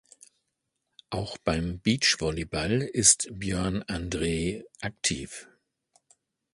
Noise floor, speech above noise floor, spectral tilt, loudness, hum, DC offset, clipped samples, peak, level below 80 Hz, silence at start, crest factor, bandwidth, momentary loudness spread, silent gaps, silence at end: -81 dBFS; 53 dB; -3 dB/octave; -27 LUFS; none; under 0.1%; under 0.1%; -6 dBFS; -46 dBFS; 1.1 s; 24 dB; 11.5 kHz; 16 LU; none; 1.1 s